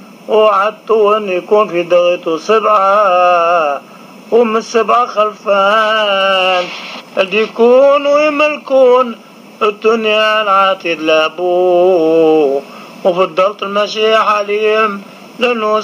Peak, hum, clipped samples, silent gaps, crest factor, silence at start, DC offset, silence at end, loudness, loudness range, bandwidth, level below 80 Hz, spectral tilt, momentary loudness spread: 0 dBFS; none; under 0.1%; none; 12 dB; 0 s; under 0.1%; 0 s; -11 LUFS; 1 LU; 15 kHz; -70 dBFS; -4 dB/octave; 7 LU